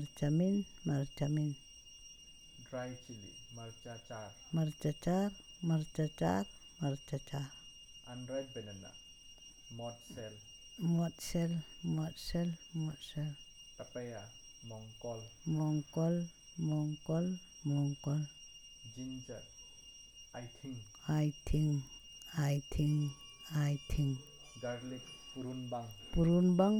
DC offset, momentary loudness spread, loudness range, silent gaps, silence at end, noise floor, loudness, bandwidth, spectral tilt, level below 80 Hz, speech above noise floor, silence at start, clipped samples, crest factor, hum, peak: under 0.1%; 18 LU; 7 LU; none; 0 s; -57 dBFS; -38 LUFS; 15 kHz; -6.5 dB/octave; -54 dBFS; 20 dB; 0 s; under 0.1%; 20 dB; none; -18 dBFS